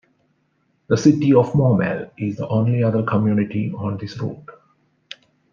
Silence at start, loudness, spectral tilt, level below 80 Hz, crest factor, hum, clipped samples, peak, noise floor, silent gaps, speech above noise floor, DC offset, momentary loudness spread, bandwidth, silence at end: 0.9 s; -19 LUFS; -8 dB/octave; -58 dBFS; 18 dB; none; under 0.1%; -2 dBFS; -66 dBFS; none; 47 dB; under 0.1%; 23 LU; 7.4 kHz; 1 s